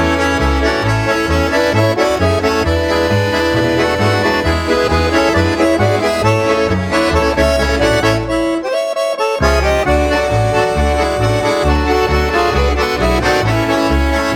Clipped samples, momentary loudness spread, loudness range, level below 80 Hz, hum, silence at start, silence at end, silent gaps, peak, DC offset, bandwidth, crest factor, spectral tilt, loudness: under 0.1%; 2 LU; 1 LU; -22 dBFS; none; 0 s; 0 s; none; 0 dBFS; under 0.1%; 17.5 kHz; 12 dB; -5.5 dB/octave; -14 LUFS